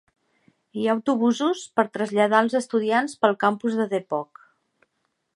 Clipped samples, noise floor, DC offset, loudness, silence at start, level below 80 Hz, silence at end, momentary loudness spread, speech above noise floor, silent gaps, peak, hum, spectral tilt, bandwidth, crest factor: under 0.1%; -75 dBFS; under 0.1%; -23 LUFS; 0.75 s; -76 dBFS; 1.1 s; 9 LU; 53 dB; none; -2 dBFS; none; -5 dB/octave; 11.5 kHz; 22 dB